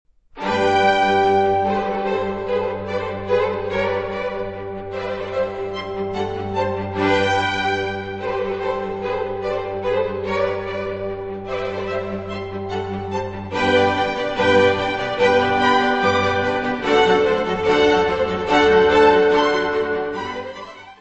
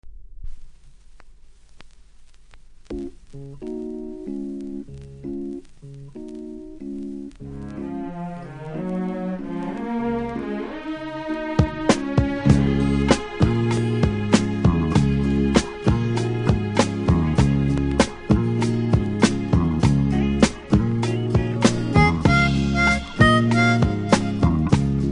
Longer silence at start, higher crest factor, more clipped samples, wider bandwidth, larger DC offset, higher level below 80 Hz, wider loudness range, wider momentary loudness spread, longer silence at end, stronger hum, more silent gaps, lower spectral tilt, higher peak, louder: first, 0.35 s vs 0.05 s; about the same, 16 dB vs 20 dB; neither; second, 8.4 kHz vs 10.5 kHz; neither; second, -46 dBFS vs -32 dBFS; second, 8 LU vs 16 LU; second, 12 LU vs 17 LU; about the same, 0.05 s vs 0 s; neither; neither; about the same, -5.5 dB/octave vs -6.5 dB/octave; about the same, -2 dBFS vs 0 dBFS; about the same, -20 LUFS vs -21 LUFS